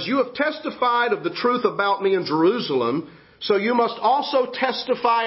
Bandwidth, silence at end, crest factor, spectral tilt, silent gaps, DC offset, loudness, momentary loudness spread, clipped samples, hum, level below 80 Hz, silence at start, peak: 5.8 kHz; 0 s; 16 dB; -8.5 dB/octave; none; under 0.1%; -21 LUFS; 4 LU; under 0.1%; none; -66 dBFS; 0 s; -6 dBFS